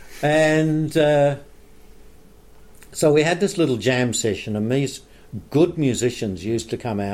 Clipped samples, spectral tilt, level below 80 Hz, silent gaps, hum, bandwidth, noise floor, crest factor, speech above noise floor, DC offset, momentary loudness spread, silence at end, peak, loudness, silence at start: under 0.1%; -5.5 dB/octave; -50 dBFS; none; none; 16 kHz; -46 dBFS; 16 dB; 26 dB; under 0.1%; 11 LU; 0 s; -6 dBFS; -20 LUFS; 0 s